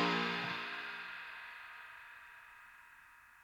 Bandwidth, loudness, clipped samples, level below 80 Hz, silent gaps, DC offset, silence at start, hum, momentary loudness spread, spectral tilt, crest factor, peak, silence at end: 19.5 kHz; -41 LUFS; under 0.1%; -80 dBFS; none; under 0.1%; 0 s; none; 22 LU; -4.5 dB/octave; 20 dB; -22 dBFS; 0 s